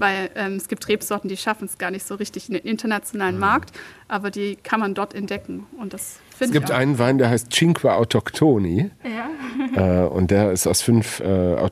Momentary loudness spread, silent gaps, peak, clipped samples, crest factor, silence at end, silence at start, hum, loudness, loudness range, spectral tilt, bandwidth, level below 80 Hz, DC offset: 11 LU; none; -4 dBFS; under 0.1%; 18 dB; 0 s; 0 s; none; -21 LUFS; 6 LU; -5 dB/octave; 15 kHz; -50 dBFS; under 0.1%